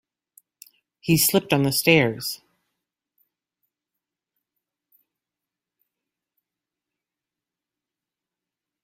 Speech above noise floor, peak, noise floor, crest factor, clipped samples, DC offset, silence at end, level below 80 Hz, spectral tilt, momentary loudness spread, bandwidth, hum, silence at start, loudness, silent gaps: 68 dB; -2 dBFS; -88 dBFS; 26 dB; under 0.1%; under 0.1%; 6.5 s; -62 dBFS; -4 dB/octave; 15 LU; 16.5 kHz; none; 1.05 s; -20 LUFS; none